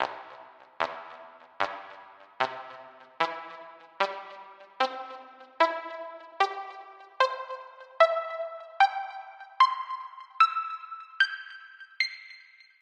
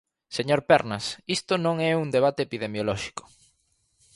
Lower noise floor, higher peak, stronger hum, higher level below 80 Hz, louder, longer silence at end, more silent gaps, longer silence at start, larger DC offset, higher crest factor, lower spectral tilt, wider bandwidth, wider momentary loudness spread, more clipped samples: second, -53 dBFS vs -70 dBFS; second, -8 dBFS vs -4 dBFS; neither; second, -82 dBFS vs -60 dBFS; second, -29 LUFS vs -25 LUFS; second, 0.45 s vs 0.95 s; neither; second, 0 s vs 0.3 s; neither; about the same, 24 dB vs 22 dB; second, -2 dB/octave vs -5 dB/octave; second, 10 kHz vs 11.5 kHz; first, 23 LU vs 11 LU; neither